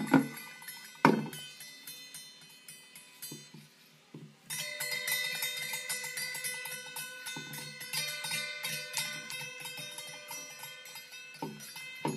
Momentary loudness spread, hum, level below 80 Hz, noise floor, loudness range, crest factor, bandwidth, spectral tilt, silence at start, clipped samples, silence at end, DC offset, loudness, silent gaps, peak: 19 LU; none; -82 dBFS; -60 dBFS; 6 LU; 32 dB; 15.5 kHz; -3 dB/octave; 0 s; under 0.1%; 0 s; under 0.1%; -36 LUFS; none; -4 dBFS